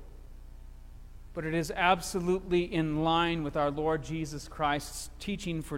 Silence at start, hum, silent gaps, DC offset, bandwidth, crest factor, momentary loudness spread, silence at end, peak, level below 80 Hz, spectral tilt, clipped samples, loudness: 0 s; none; none; under 0.1%; 16.5 kHz; 20 dB; 11 LU; 0 s; -10 dBFS; -46 dBFS; -5 dB/octave; under 0.1%; -31 LUFS